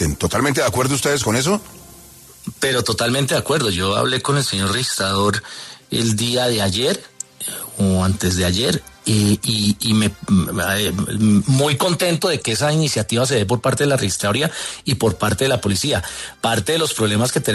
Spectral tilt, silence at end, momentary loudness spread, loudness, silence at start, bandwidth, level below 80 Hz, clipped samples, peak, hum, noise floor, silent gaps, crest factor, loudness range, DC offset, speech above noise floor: -4 dB/octave; 0 s; 6 LU; -18 LUFS; 0 s; 14 kHz; -46 dBFS; under 0.1%; -4 dBFS; none; -43 dBFS; none; 16 dB; 2 LU; under 0.1%; 25 dB